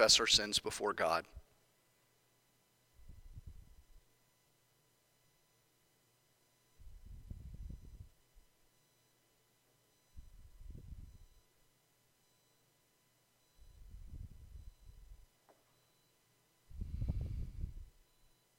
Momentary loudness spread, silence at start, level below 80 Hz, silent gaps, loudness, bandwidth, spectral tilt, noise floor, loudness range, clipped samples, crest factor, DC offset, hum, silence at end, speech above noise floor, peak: 29 LU; 0 s; -54 dBFS; none; -34 LUFS; 16.5 kHz; -2 dB/octave; -75 dBFS; 21 LU; under 0.1%; 30 dB; under 0.1%; none; 0.7 s; 42 dB; -14 dBFS